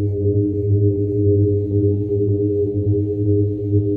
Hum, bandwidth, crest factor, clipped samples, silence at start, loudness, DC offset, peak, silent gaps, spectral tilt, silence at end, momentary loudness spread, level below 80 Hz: none; 0.9 kHz; 12 dB; under 0.1%; 0 s; -18 LUFS; under 0.1%; -6 dBFS; none; -15 dB/octave; 0 s; 2 LU; -42 dBFS